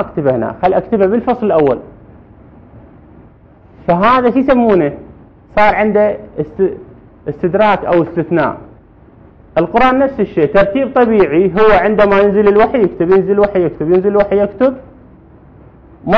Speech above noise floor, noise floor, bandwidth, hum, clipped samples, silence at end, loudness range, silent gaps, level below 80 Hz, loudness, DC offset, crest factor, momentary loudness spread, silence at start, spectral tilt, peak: 31 dB; -42 dBFS; 6 kHz; none; under 0.1%; 0 s; 6 LU; none; -38 dBFS; -12 LUFS; under 0.1%; 12 dB; 10 LU; 0 s; -9 dB/octave; 0 dBFS